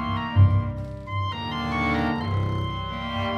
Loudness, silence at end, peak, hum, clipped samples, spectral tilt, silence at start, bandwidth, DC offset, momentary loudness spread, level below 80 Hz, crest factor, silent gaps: -25 LUFS; 0 s; -6 dBFS; none; under 0.1%; -7.5 dB/octave; 0 s; 6.6 kHz; under 0.1%; 10 LU; -40 dBFS; 18 dB; none